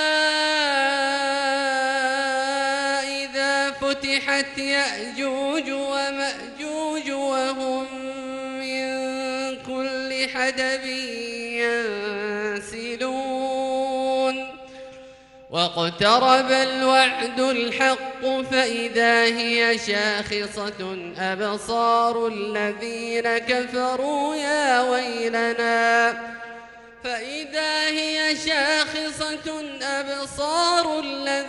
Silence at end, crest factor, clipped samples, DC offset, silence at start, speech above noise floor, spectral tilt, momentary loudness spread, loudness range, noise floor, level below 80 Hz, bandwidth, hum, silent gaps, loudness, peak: 0 s; 20 dB; under 0.1%; under 0.1%; 0 s; 23 dB; -2.5 dB/octave; 11 LU; 6 LU; -46 dBFS; -60 dBFS; 12 kHz; none; none; -22 LUFS; -4 dBFS